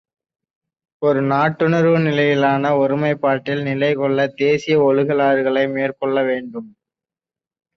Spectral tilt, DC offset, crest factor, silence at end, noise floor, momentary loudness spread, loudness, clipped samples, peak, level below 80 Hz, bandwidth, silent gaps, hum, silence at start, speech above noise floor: -7.5 dB/octave; under 0.1%; 14 dB; 1.1 s; under -90 dBFS; 6 LU; -17 LUFS; under 0.1%; -4 dBFS; -62 dBFS; 6.8 kHz; none; none; 1 s; over 73 dB